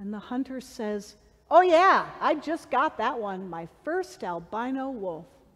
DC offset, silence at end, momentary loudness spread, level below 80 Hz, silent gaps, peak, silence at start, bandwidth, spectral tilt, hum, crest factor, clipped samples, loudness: under 0.1%; 0.3 s; 17 LU; -64 dBFS; none; -6 dBFS; 0 s; 13 kHz; -5 dB/octave; none; 20 dB; under 0.1%; -26 LUFS